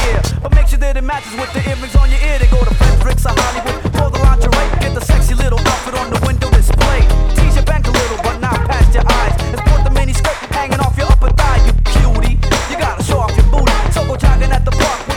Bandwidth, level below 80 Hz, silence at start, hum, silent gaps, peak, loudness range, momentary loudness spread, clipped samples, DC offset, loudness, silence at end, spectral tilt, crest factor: 13.5 kHz; -12 dBFS; 0 s; none; none; 0 dBFS; 1 LU; 5 LU; under 0.1%; under 0.1%; -14 LUFS; 0 s; -5 dB/octave; 10 dB